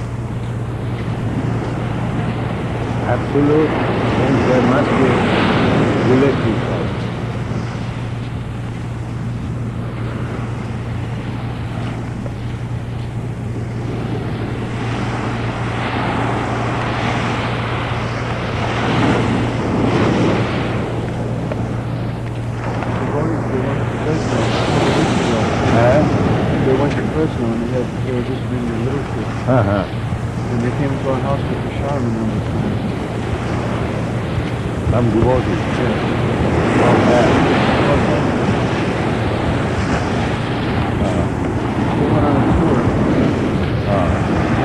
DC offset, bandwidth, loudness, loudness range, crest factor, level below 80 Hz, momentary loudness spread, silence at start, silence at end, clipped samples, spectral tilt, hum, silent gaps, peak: under 0.1%; 11 kHz; -18 LUFS; 9 LU; 14 dB; -34 dBFS; 10 LU; 0 s; 0 s; under 0.1%; -7 dB/octave; none; none; -4 dBFS